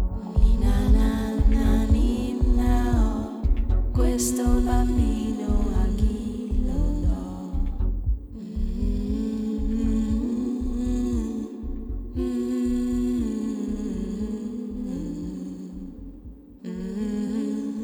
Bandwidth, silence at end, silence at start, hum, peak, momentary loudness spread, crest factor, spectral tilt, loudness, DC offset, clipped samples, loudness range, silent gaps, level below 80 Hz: 13.5 kHz; 0 s; 0 s; none; -6 dBFS; 11 LU; 16 dB; -7 dB/octave; -26 LUFS; under 0.1%; under 0.1%; 8 LU; none; -26 dBFS